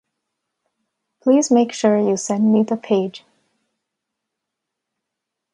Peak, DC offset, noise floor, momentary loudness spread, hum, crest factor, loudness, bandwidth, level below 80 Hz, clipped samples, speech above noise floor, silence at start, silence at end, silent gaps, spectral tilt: -4 dBFS; under 0.1%; -81 dBFS; 6 LU; none; 18 dB; -18 LUFS; 10.5 kHz; -72 dBFS; under 0.1%; 65 dB; 1.25 s; 2.35 s; none; -5.5 dB/octave